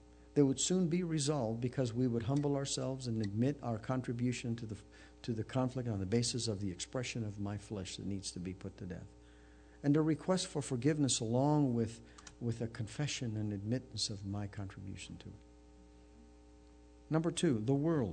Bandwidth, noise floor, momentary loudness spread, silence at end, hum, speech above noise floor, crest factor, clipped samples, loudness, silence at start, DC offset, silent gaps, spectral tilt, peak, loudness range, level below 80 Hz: 9.4 kHz; -59 dBFS; 14 LU; 0 s; none; 24 dB; 20 dB; under 0.1%; -36 LUFS; 0.1 s; under 0.1%; none; -5.5 dB/octave; -16 dBFS; 8 LU; -62 dBFS